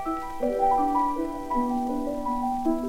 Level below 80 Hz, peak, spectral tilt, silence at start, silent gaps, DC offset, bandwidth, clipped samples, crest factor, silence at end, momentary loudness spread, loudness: -44 dBFS; -12 dBFS; -6 dB/octave; 0 s; none; under 0.1%; 17 kHz; under 0.1%; 14 dB; 0 s; 6 LU; -26 LUFS